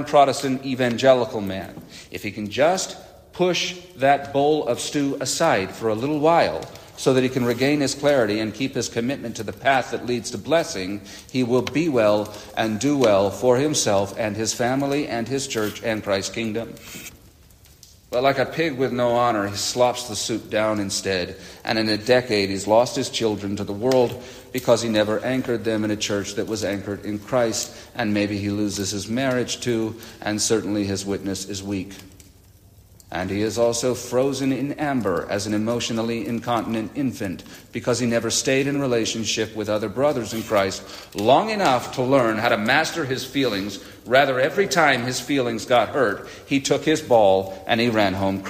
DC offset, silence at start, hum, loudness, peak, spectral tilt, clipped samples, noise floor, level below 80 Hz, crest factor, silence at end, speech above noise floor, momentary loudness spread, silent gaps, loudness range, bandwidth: under 0.1%; 0 s; none; -22 LUFS; -2 dBFS; -4 dB/octave; under 0.1%; -50 dBFS; -56 dBFS; 20 dB; 0 s; 29 dB; 11 LU; none; 5 LU; 15.5 kHz